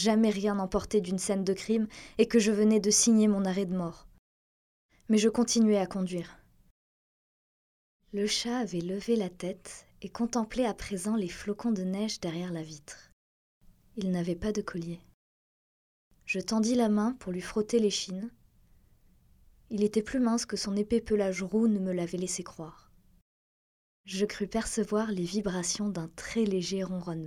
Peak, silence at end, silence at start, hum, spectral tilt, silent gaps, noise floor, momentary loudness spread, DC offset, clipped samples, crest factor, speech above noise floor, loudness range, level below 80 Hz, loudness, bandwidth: -10 dBFS; 0 s; 0 s; none; -4.5 dB/octave; 4.19-4.89 s, 6.71-8.00 s, 13.13-13.61 s, 15.14-16.11 s, 23.22-24.04 s; -62 dBFS; 14 LU; under 0.1%; under 0.1%; 20 dB; 33 dB; 9 LU; -56 dBFS; -30 LUFS; 13.5 kHz